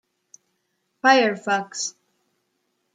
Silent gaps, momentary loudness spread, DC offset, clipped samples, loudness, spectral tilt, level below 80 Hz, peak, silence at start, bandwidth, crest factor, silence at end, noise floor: none; 12 LU; under 0.1%; under 0.1%; -21 LUFS; -2.5 dB/octave; -82 dBFS; -2 dBFS; 1.05 s; 9.6 kHz; 22 dB; 1.05 s; -73 dBFS